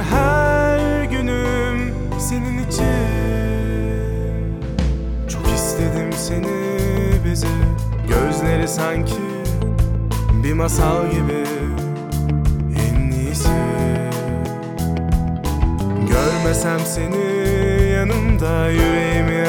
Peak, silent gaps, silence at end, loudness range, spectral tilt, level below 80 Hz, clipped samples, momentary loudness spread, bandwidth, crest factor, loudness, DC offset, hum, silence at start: -2 dBFS; none; 0 s; 3 LU; -6 dB/octave; -24 dBFS; under 0.1%; 6 LU; 19 kHz; 16 dB; -19 LUFS; under 0.1%; none; 0 s